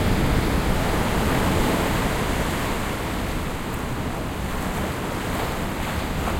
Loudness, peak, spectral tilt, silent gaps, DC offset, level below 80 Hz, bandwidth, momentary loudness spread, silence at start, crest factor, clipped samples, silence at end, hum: -24 LUFS; -8 dBFS; -5 dB/octave; none; under 0.1%; -30 dBFS; 16.5 kHz; 7 LU; 0 s; 16 dB; under 0.1%; 0 s; none